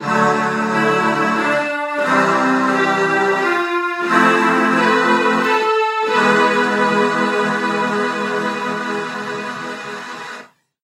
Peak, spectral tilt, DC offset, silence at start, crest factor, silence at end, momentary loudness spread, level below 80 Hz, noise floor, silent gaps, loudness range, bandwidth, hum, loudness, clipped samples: 0 dBFS; -4.5 dB/octave; under 0.1%; 0 s; 16 dB; 0.4 s; 11 LU; -72 dBFS; -39 dBFS; none; 5 LU; 15 kHz; none; -16 LUFS; under 0.1%